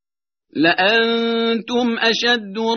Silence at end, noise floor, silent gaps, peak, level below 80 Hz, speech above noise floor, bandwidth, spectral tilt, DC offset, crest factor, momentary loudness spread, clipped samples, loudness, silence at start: 0 s; -81 dBFS; none; -2 dBFS; -64 dBFS; 63 dB; 6.6 kHz; -1 dB/octave; under 0.1%; 16 dB; 5 LU; under 0.1%; -17 LUFS; 0.55 s